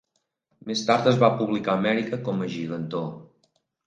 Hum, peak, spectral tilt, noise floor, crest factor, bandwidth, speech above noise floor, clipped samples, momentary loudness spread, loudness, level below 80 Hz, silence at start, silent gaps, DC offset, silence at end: none; -4 dBFS; -6 dB/octave; -74 dBFS; 20 dB; 9.4 kHz; 51 dB; under 0.1%; 11 LU; -24 LUFS; -68 dBFS; 0.65 s; none; under 0.1%; 0.6 s